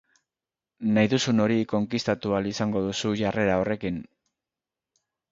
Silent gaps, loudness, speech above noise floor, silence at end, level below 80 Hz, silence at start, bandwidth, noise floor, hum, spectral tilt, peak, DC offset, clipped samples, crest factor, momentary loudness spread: none; -25 LUFS; over 65 dB; 1.3 s; -56 dBFS; 0.8 s; 7.8 kHz; under -90 dBFS; none; -5.5 dB/octave; -8 dBFS; under 0.1%; under 0.1%; 20 dB; 7 LU